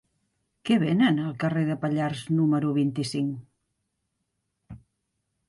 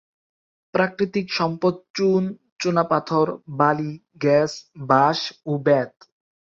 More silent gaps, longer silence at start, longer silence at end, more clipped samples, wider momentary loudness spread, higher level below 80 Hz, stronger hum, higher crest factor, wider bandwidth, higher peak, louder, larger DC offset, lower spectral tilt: second, none vs 1.90-1.94 s, 2.52-2.56 s; about the same, 0.65 s vs 0.75 s; about the same, 0.7 s vs 0.7 s; neither; about the same, 8 LU vs 8 LU; about the same, -64 dBFS vs -64 dBFS; neither; about the same, 16 dB vs 20 dB; first, 11.5 kHz vs 7.8 kHz; second, -10 dBFS vs -4 dBFS; second, -25 LUFS vs -22 LUFS; neither; about the same, -7 dB/octave vs -6 dB/octave